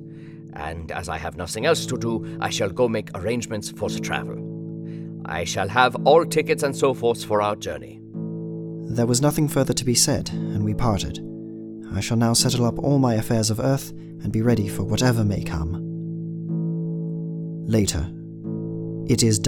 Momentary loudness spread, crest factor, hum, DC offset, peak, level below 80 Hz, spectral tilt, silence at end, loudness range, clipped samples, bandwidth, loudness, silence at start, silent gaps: 14 LU; 22 dB; none; under 0.1%; 0 dBFS; -44 dBFS; -5 dB/octave; 0 s; 5 LU; under 0.1%; 18.5 kHz; -23 LUFS; 0 s; none